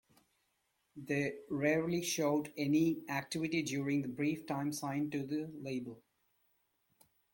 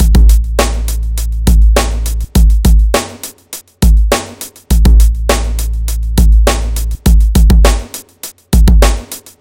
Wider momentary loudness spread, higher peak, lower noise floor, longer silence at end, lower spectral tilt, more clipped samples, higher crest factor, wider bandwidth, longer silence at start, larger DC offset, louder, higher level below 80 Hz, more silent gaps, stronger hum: second, 9 LU vs 16 LU; second, -20 dBFS vs 0 dBFS; first, -80 dBFS vs -32 dBFS; first, 1.35 s vs 0.2 s; about the same, -5 dB/octave vs -5 dB/octave; second, under 0.1% vs 1%; first, 18 dB vs 8 dB; about the same, 17 kHz vs 16.5 kHz; first, 0.95 s vs 0 s; neither; second, -36 LUFS vs -12 LUFS; second, -74 dBFS vs -10 dBFS; neither; neither